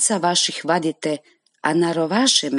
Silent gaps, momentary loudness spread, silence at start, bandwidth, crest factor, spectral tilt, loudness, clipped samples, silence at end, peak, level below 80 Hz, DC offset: none; 10 LU; 0 s; 11.5 kHz; 16 dB; -2.5 dB/octave; -19 LUFS; under 0.1%; 0 s; -4 dBFS; -72 dBFS; under 0.1%